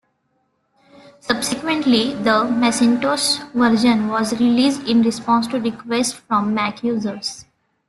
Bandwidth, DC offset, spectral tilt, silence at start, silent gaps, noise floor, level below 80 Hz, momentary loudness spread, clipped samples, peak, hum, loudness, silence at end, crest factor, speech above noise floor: 12.5 kHz; under 0.1%; -3.5 dB/octave; 1.25 s; none; -67 dBFS; -58 dBFS; 7 LU; under 0.1%; -2 dBFS; none; -18 LUFS; 0.45 s; 18 dB; 49 dB